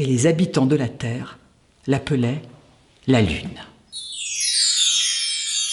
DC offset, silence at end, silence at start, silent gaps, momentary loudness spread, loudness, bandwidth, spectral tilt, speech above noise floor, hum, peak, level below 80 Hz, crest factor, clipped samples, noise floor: under 0.1%; 0 s; 0 s; none; 18 LU; -20 LUFS; 11.5 kHz; -3.5 dB/octave; 32 dB; none; -6 dBFS; -46 dBFS; 16 dB; under 0.1%; -52 dBFS